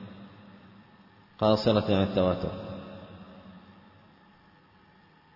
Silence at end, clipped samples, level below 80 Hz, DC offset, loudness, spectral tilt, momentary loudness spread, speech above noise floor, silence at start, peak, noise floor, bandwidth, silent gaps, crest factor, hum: 1.75 s; under 0.1%; -60 dBFS; under 0.1%; -27 LUFS; -8 dB/octave; 25 LU; 34 dB; 0 s; -10 dBFS; -59 dBFS; 5.8 kHz; none; 20 dB; none